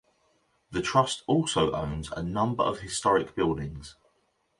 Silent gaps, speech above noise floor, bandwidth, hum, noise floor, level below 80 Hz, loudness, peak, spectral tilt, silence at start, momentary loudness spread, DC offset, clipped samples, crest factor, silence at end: none; 44 dB; 11.5 kHz; none; -72 dBFS; -50 dBFS; -27 LUFS; -8 dBFS; -5 dB/octave; 0.7 s; 10 LU; under 0.1%; under 0.1%; 20 dB; 0.65 s